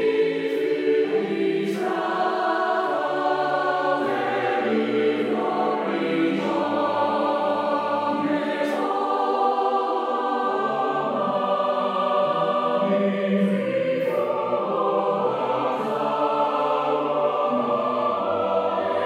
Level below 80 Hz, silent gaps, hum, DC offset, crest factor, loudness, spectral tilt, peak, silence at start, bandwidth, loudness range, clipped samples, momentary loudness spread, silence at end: -78 dBFS; none; none; under 0.1%; 12 dB; -23 LUFS; -6.5 dB/octave; -10 dBFS; 0 s; 13 kHz; 1 LU; under 0.1%; 2 LU; 0 s